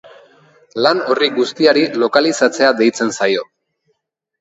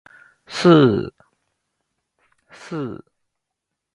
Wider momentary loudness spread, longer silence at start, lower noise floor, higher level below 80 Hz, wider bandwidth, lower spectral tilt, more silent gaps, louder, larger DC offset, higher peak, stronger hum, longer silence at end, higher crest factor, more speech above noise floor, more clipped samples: second, 5 LU vs 21 LU; first, 0.75 s vs 0.5 s; second, -69 dBFS vs -81 dBFS; second, -66 dBFS vs -56 dBFS; second, 8.2 kHz vs 11 kHz; second, -3.5 dB/octave vs -7 dB/octave; neither; about the same, -15 LUFS vs -17 LUFS; neither; about the same, 0 dBFS vs 0 dBFS; neither; about the same, 0.95 s vs 1 s; second, 16 dB vs 22 dB; second, 55 dB vs 65 dB; neither